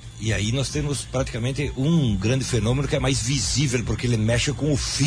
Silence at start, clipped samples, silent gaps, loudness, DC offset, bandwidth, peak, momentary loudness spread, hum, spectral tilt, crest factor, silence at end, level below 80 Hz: 0 s; under 0.1%; none; -23 LUFS; under 0.1%; 10.5 kHz; -10 dBFS; 5 LU; none; -5 dB/octave; 12 dB; 0 s; -36 dBFS